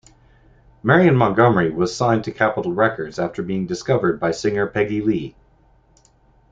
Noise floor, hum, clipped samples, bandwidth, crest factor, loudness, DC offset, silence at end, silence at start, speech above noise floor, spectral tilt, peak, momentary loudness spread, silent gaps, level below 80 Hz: -55 dBFS; none; under 0.1%; 8 kHz; 18 dB; -19 LUFS; under 0.1%; 1.2 s; 0.85 s; 37 dB; -6.5 dB/octave; -2 dBFS; 10 LU; none; -50 dBFS